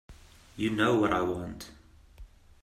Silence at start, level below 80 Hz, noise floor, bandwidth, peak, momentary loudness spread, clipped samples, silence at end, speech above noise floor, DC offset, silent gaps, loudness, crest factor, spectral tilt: 0.1 s; -54 dBFS; -51 dBFS; 14 kHz; -12 dBFS; 21 LU; under 0.1%; 0.35 s; 23 dB; under 0.1%; none; -28 LUFS; 18 dB; -6 dB/octave